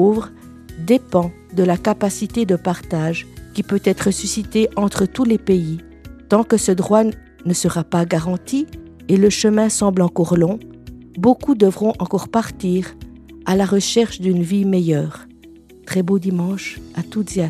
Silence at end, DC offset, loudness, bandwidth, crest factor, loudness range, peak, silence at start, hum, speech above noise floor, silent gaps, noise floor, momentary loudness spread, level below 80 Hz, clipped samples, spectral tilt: 0 s; under 0.1%; -18 LUFS; 14 kHz; 18 dB; 3 LU; 0 dBFS; 0 s; none; 26 dB; none; -44 dBFS; 12 LU; -44 dBFS; under 0.1%; -6 dB/octave